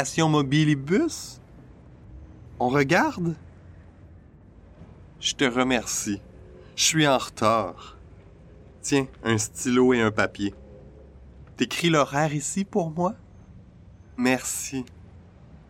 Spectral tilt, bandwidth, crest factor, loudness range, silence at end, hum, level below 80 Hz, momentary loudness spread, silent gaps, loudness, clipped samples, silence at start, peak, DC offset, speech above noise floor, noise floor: -4 dB/octave; 16 kHz; 20 dB; 4 LU; 0.15 s; none; -52 dBFS; 14 LU; none; -24 LUFS; under 0.1%; 0 s; -6 dBFS; under 0.1%; 26 dB; -50 dBFS